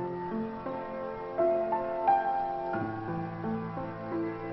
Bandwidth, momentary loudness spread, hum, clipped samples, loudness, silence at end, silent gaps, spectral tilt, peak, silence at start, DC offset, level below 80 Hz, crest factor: 5.8 kHz; 10 LU; none; under 0.1%; -32 LUFS; 0 s; none; -10 dB/octave; -14 dBFS; 0 s; under 0.1%; -60 dBFS; 18 dB